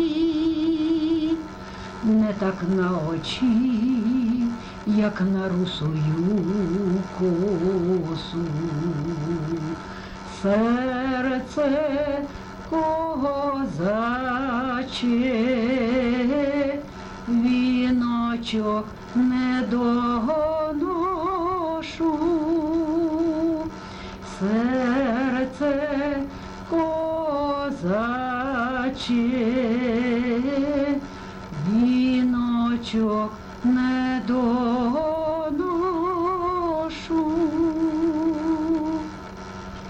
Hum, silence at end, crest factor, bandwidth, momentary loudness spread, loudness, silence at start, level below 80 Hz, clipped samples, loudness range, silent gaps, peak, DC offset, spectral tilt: none; 0 s; 12 dB; 8.6 kHz; 7 LU; -24 LUFS; 0 s; -46 dBFS; under 0.1%; 2 LU; none; -10 dBFS; under 0.1%; -7 dB/octave